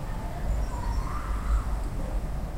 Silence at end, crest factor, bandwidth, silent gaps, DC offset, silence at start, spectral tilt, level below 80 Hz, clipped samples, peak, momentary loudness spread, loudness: 0 s; 14 dB; 15.5 kHz; none; under 0.1%; 0 s; -6.5 dB/octave; -30 dBFS; under 0.1%; -14 dBFS; 4 LU; -33 LUFS